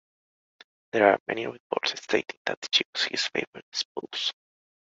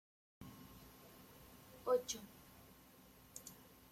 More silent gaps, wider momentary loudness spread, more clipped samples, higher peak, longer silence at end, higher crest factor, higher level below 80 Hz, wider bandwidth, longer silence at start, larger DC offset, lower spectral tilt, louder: first, 1.20-1.26 s, 1.60-1.70 s, 2.37-2.45 s, 2.57-2.62 s, 2.85-2.93 s, 3.47-3.53 s, 3.62-3.72 s, 3.85-3.95 s vs none; second, 11 LU vs 23 LU; neither; first, -4 dBFS vs -26 dBFS; first, 0.6 s vs 0 s; about the same, 24 dB vs 24 dB; about the same, -74 dBFS vs -72 dBFS; second, 8 kHz vs 16.5 kHz; first, 0.95 s vs 0.4 s; neither; about the same, -2 dB/octave vs -3 dB/octave; first, -27 LUFS vs -44 LUFS